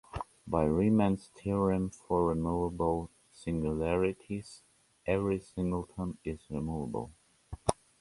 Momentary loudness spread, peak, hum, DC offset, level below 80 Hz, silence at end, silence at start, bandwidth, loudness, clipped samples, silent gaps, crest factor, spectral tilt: 13 LU; -6 dBFS; none; under 0.1%; -48 dBFS; 0.25 s; 0.15 s; 11.5 kHz; -33 LUFS; under 0.1%; none; 28 dB; -7.5 dB/octave